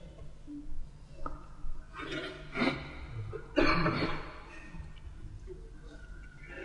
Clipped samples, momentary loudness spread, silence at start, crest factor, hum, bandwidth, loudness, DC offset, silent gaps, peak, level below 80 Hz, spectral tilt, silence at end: under 0.1%; 21 LU; 0 s; 22 dB; 50 Hz at -55 dBFS; 10 kHz; -35 LUFS; under 0.1%; none; -12 dBFS; -44 dBFS; -6 dB/octave; 0 s